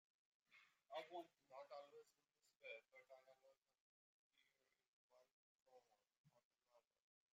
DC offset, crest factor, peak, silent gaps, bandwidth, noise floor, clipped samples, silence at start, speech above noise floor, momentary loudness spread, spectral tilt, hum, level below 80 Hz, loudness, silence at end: under 0.1%; 26 dB; -40 dBFS; 2.56-2.60 s, 3.81-4.30 s, 4.88-5.10 s, 5.31-5.58 s, 6.18-6.24 s, 6.44-6.51 s; 7.4 kHz; -86 dBFS; under 0.1%; 0.5 s; 24 dB; 12 LU; -0.5 dB/octave; none; under -90 dBFS; -60 LUFS; 0.5 s